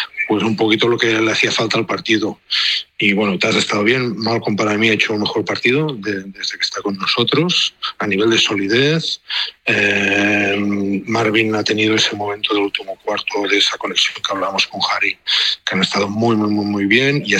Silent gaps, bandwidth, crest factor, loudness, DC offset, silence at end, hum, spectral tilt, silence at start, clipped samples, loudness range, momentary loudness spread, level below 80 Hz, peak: none; 13 kHz; 16 dB; -16 LUFS; under 0.1%; 0 s; none; -4 dB/octave; 0 s; under 0.1%; 2 LU; 6 LU; -60 dBFS; -2 dBFS